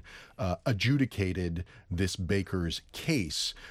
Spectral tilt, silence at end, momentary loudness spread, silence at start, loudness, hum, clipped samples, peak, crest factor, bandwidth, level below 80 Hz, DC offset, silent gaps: -5 dB/octave; 0 s; 9 LU; 0.05 s; -31 LUFS; none; under 0.1%; -14 dBFS; 16 dB; 16 kHz; -48 dBFS; under 0.1%; none